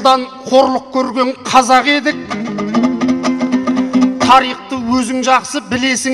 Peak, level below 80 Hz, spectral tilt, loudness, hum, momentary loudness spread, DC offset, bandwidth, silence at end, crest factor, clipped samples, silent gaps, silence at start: 0 dBFS; -48 dBFS; -3.5 dB/octave; -13 LUFS; none; 9 LU; under 0.1%; 12.5 kHz; 0 s; 14 dB; under 0.1%; none; 0 s